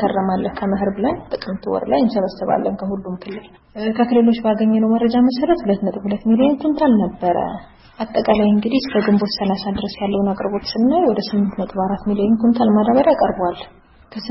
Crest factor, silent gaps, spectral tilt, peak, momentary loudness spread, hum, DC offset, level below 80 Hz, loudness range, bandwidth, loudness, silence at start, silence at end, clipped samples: 18 dB; none; -9.5 dB/octave; 0 dBFS; 11 LU; none; under 0.1%; -46 dBFS; 4 LU; 5.8 kHz; -18 LUFS; 0 s; 0 s; under 0.1%